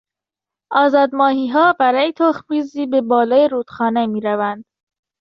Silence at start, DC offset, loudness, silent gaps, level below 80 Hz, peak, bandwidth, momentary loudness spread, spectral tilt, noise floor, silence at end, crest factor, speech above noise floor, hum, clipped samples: 0.7 s; under 0.1%; -16 LUFS; none; -64 dBFS; -2 dBFS; 6.4 kHz; 8 LU; -6.5 dB/octave; -87 dBFS; 0.6 s; 14 dB; 71 dB; none; under 0.1%